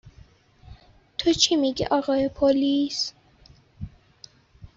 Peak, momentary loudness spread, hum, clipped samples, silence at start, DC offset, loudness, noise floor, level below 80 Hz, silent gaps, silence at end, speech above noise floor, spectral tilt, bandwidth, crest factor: -6 dBFS; 22 LU; none; under 0.1%; 0.05 s; under 0.1%; -23 LUFS; -55 dBFS; -50 dBFS; none; 0.1 s; 32 dB; -3.5 dB/octave; 7.8 kHz; 20 dB